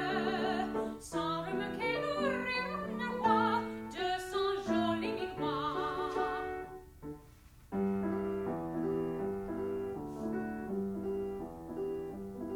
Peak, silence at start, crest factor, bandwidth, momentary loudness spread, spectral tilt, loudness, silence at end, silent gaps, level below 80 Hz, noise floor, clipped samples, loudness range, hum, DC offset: -16 dBFS; 0 s; 18 dB; 17.5 kHz; 9 LU; -6 dB/octave; -35 LUFS; 0 s; none; -58 dBFS; -57 dBFS; under 0.1%; 4 LU; none; under 0.1%